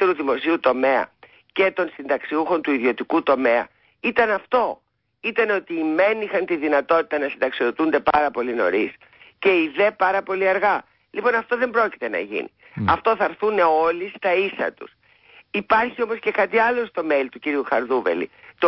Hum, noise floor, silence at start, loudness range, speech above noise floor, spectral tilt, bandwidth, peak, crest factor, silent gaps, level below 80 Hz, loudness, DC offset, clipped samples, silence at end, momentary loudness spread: none; -52 dBFS; 0 s; 1 LU; 31 dB; -9.5 dB/octave; 5.8 kHz; -6 dBFS; 16 dB; none; -56 dBFS; -21 LUFS; under 0.1%; under 0.1%; 0 s; 8 LU